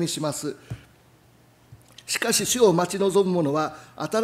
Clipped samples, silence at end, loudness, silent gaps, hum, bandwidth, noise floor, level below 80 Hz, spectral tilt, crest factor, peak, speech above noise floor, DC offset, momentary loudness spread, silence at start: under 0.1%; 0 s; -23 LUFS; none; none; 16 kHz; -56 dBFS; -60 dBFS; -4 dB/octave; 20 dB; -6 dBFS; 33 dB; under 0.1%; 20 LU; 0 s